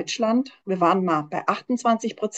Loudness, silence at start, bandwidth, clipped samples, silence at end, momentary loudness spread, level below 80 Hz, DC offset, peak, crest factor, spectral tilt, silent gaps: -23 LUFS; 0 s; 8.8 kHz; under 0.1%; 0 s; 5 LU; -72 dBFS; under 0.1%; -6 dBFS; 18 dB; -5 dB/octave; none